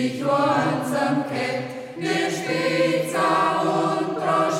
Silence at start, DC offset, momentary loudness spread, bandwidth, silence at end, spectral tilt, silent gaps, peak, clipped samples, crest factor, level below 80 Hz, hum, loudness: 0 s; under 0.1%; 6 LU; 16.5 kHz; 0 s; -5 dB/octave; none; -8 dBFS; under 0.1%; 14 dB; -68 dBFS; none; -22 LUFS